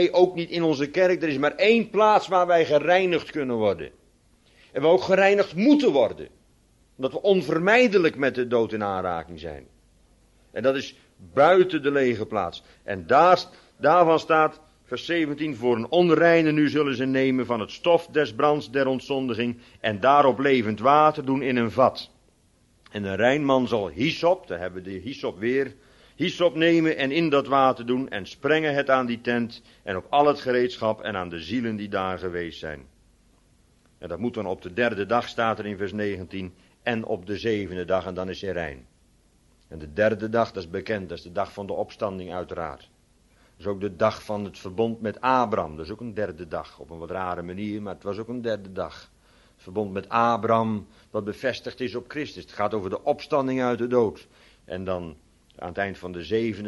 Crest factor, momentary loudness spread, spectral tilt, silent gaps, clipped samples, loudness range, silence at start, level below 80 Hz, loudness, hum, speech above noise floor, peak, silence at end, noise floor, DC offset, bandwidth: 20 dB; 15 LU; -6 dB/octave; none; under 0.1%; 9 LU; 0 s; -58 dBFS; -24 LUFS; none; 38 dB; -4 dBFS; 0 s; -61 dBFS; under 0.1%; 11.5 kHz